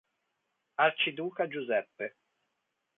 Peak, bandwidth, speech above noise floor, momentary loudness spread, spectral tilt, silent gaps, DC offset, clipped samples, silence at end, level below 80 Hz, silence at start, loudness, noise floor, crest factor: -12 dBFS; 4 kHz; 51 dB; 14 LU; -7 dB/octave; none; under 0.1%; under 0.1%; 0.9 s; -82 dBFS; 0.8 s; -31 LUFS; -82 dBFS; 22 dB